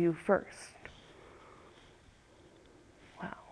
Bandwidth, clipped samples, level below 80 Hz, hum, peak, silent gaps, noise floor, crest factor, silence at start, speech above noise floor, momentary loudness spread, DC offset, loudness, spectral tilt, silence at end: 11 kHz; under 0.1%; -66 dBFS; none; -14 dBFS; none; -61 dBFS; 24 dB; 0 s; 27 dB; 28 LU; under 0.1%; -35 LUFS; -6.5 dB/octave; 0.1 s